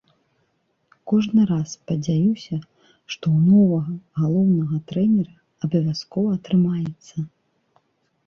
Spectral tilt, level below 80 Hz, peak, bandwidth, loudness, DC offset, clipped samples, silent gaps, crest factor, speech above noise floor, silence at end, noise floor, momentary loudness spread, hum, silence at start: -8 dB/octave; -60 dBFS; -8 dBFS; 7 kHz; -21 LUFS; under 0.1%; under 0.1%; none; 14 dB; 49 dB; 1 s; -69 dBFS; 15 LU; none; 1.05 s